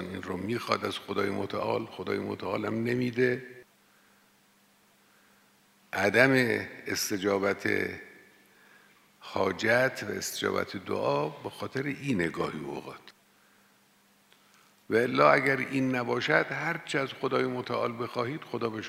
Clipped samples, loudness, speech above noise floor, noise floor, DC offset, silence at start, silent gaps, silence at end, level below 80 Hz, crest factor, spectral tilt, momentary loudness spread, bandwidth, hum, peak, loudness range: under 0.1%; -29 LUFS; 35 dB; -64 dBFS; under 0.1%; 0 s; none; 0 s; -70 dBFS; 24 dB; -4.5 dB/octave; 13 LU; 16 kHz; none; -6 dBFS; 7 LU